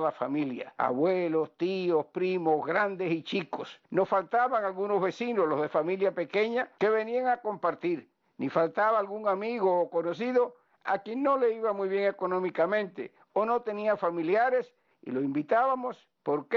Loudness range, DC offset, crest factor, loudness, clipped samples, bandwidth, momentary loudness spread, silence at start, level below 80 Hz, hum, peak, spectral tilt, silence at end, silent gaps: 1 LU; under 0.1%; 16 dB; -29 LUFS; under 0.1%; 7 kHz; 7 LU; 0 s; -78 dBFS; none; -14 dBFS; -4.5 dB/octave; 0 s; none